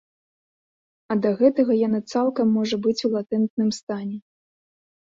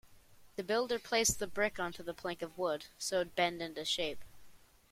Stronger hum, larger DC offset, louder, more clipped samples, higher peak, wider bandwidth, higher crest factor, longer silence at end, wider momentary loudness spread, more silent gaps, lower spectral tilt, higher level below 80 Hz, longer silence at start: neither; neither; first, -22 LUFS vs -35 LUFS; neither; first, -6 dBFS vs -18 dBFS; second, 7.8 kHz vs 16.5 kHz; about the same, 18 dB vs 20 dB; first, 0.85 s vs 0.35 s; about the same, 11 LU vs 11 LU; first, 3.50-3.57 s, 3.83-3.87 s vs none; first, -6.5 dB/octave vs -2 dB/octave; second, -68 dBFS vs -62 dBFS; first, 1.1 s vs 0.05 s